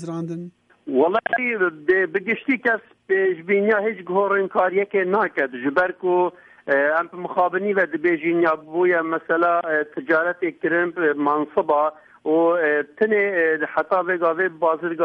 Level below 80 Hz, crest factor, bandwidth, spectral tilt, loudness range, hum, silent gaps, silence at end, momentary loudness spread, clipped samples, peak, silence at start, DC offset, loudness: -68 dBFS; 14 dB; 5.4 kHz; -8 dB/octave; 1 LU; none; none; 0 s; 5 LU; under 0.1%; -6 dBFS; 0 s; under 0.1%; -21 LUFS